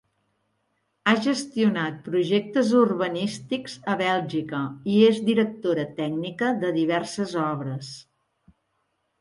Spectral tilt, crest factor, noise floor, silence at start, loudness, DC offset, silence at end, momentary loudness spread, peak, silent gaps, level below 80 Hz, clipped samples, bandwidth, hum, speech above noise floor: -5.5 dB/octave; 20 dB; -74 dBFS; 1.05 s; -24 LUFS; under 0.1%; 1.2 s; 11 LU; -4 dBFS; none; -68 dBFS; under 0.1%; 11.5 kHz; none; 50 dB